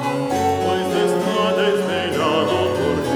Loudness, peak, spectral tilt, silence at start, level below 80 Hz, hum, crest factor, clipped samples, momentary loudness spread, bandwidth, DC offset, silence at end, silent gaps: -19 LUFS; -6 dBFS; -5 dB/octave; 0 s; -50 dBFS; none; 14 dB; under 0.1%; 2 LU; 18 kHz; under 0.1%; 0 s; none